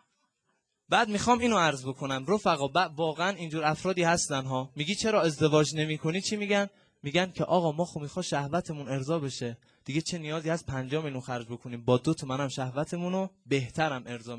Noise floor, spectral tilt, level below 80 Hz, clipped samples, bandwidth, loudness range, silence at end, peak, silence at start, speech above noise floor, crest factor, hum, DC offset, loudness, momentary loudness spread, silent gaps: -78 dBFS; -4.5 dB/octave; -60 dBFS; under 0.1%; 11 kHz; 5 LU; 0 s; -10 dBFS; 0.9 s; 48 dB; 20 dB; none; under 0.1%; -29 LUFS; 10 LU; none